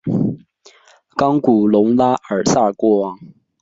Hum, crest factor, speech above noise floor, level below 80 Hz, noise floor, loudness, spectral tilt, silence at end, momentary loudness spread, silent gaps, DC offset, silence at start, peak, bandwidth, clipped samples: none; 14 dB; 34 dB; -54 dBFS; -49 dBFS; -16 LUFS; -6.5 dB/octave; 0.35 s; 11 LU; none; under 0.1%; 0.05 s; -2 dBFS; 8 kHz; under 0.1%